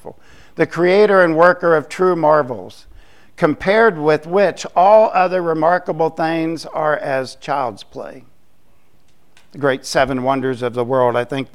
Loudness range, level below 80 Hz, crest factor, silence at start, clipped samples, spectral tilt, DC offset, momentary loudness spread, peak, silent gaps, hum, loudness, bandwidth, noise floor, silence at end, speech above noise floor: 8 LU; -50 dBFS; 16 dB; 0.05 s; under 0.1%; -6 dB/octave; 0.8%; 11 LU; 0 dBFS; none; none; -16 LUFS; 12.5 kHz; -58 dBFS; 0.1 s; 42 dB